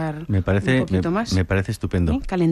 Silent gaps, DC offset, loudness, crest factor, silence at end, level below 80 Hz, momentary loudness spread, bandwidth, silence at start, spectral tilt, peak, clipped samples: none; under 0.1%; -21 LUFS; 14 dB; 0 s; -34 dBFS; 4 LU; 12.5 kHz; 0 s; -7 dB/octave; -8 dBFS; under 0.1%